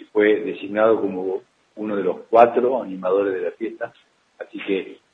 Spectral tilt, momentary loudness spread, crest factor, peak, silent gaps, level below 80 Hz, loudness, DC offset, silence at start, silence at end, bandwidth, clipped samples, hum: -7.5 dB/octave; 17 LU; 22 dB; 0 dBFS; none; -72 dBFS; -21 LUFS; under 0.1%; 0.15 s; 0.2 s; 5.2 kHz; under 0.1%; none